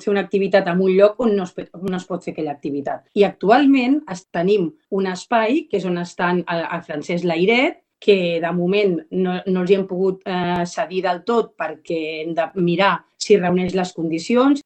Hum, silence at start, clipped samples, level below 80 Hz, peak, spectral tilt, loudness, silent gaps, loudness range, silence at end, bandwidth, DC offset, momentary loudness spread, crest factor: none; 0 s; under 0.1%; -60 dBFS; 0 dBFS; -6 dB/octave; -19 LUFS; none; 3 LU; 0.05 s; 8.8 kHz; under 0.1%; 11 LU; 18 dB